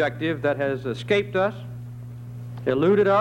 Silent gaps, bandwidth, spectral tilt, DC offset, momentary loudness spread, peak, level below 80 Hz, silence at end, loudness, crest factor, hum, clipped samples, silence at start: none; 9.6 kHz; -7.5 dB/octave; under 0.1%; 18 LU; -10 dBFS; -56 dBFS; 0 s; -23 LUFS; 14 dB; 60 Hz at -35 dBFS; under 0.1%; 0 s